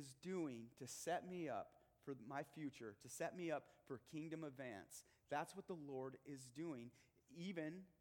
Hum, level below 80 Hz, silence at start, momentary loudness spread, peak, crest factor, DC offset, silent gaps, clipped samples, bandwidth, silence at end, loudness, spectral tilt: none; -86 dBFS; 0 s; 11 LU; -32 dBFS; 20 dB; under 0.1%; none; under 0.1%; 19 kHz; 0.1 s; -51 LUFS; -5 dB/octave